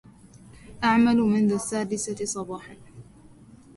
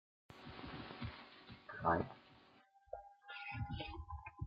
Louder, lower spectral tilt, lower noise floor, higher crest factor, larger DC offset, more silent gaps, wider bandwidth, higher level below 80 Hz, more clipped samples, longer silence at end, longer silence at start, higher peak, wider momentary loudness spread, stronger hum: first, -24 LUFS vs -45 LUFS; about the same, -5 dB/octave vs -4.5 dB/octave; second, -50 dBFS vs -69 dBFS; second, 16 dB vs 26 dB; neither; neither; first, 11.5 kHz vs 7.6 kHz; about the same, -56 dBFS vs -60 dBFS; neither; first, 0.75 s vs 0 s; first, 0.65 s vs 0.3 s; first, -10 dBFS vs -22 dBFS; second, 17 LU vs 21 LU; neither